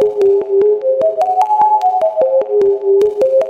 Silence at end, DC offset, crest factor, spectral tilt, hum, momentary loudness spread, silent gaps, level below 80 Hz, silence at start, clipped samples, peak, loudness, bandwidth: 0 s; under 0.1%; 10 dB; -6 dB/octave; none; 3 LU; none; -58 dBFS; 0 s; under 0.1%; -2 dBFS; -13 LUFS; 7.8 kHz